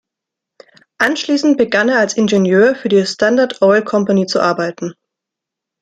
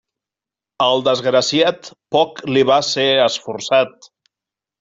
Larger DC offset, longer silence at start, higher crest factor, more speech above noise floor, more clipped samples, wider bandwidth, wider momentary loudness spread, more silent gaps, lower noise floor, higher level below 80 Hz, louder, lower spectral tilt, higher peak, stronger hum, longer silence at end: neither; first, 1 s vs 0.8 s; about the same, 14 dB vs 16 dB; about the same, 69 dB vs 72 dB; neither; first, 11 kHz vs 7.8 kHz; about the same, 5 LU vs 6 LU; neither; second, -82 dBFS vs -88 dBFS; about the same, -60 dBFS vs -60 dBFS; about the same, -14 LUFS vs -16 LUFS; first, -5 dB/octave vs -3.5 dB/octave; about the same, 0 dBFS vs -2 dBFS; neither; about the same, 0.9 s vs 0.9 s